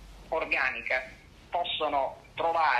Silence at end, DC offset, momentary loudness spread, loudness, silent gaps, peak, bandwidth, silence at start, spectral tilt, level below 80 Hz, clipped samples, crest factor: 0 s; under 0.1%; 8 LU; -30 LUFS; none; -12 dBFS; 13 kHz; 0 s; -3.5 dB/octave; -56 dBFS; under 0.1%; 18 dB